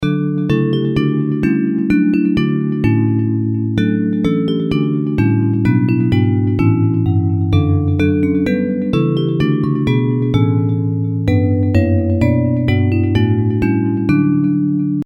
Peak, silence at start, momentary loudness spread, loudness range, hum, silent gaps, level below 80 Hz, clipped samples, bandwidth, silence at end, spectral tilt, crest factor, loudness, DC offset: -2 dBFS; 0 s; 3 LU; 1 LU; none; none; -38 dBFS; under 0.1%; 6.2 kHz; 0 s; -9.5 dB/octave; 12 dB; -15 LUFS; under 0.1%